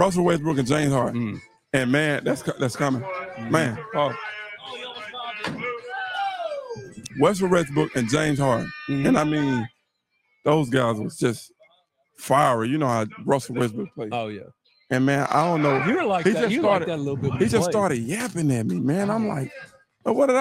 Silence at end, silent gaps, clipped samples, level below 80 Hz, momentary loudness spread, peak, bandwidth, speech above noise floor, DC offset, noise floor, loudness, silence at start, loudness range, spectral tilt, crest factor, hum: 0 s; none; under 0.1%; -56 dBFS; 13 LU; -4 dBFS; 16 kHz; 50 dB; under 0.1%; -72 dBFS; -23 LUFS; 0 s; 5 LU; -6 dB/octave; 20 dB; none